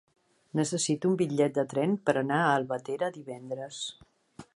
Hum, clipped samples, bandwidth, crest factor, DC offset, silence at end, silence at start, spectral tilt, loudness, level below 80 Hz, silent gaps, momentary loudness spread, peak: none; under 0.1%; 11.5 kHz; 20 dB; under 0.1%; 0.15 s; 0.55 s; -5 dB/octave; -29 LUFS; -74 dBFS; none; 12 LU; -10 dBFS